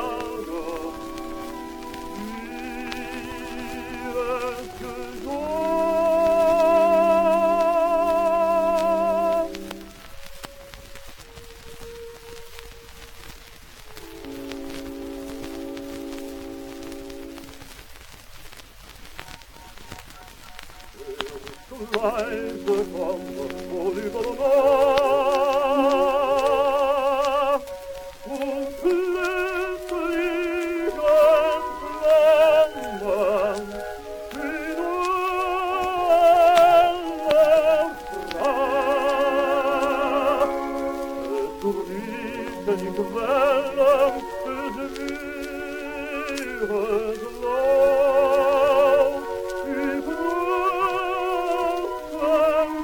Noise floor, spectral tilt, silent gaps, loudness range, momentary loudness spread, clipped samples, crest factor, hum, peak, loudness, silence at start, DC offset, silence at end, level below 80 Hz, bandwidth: -44 dBFS; -4.5 dB/octave; none; 19 LU; 23 LU; under 0.1%; 22 dB; none; -2 dBFS; -22 LUFS; 0 s; under 0.1%; 0 s; -48 dBFS; 18 kHz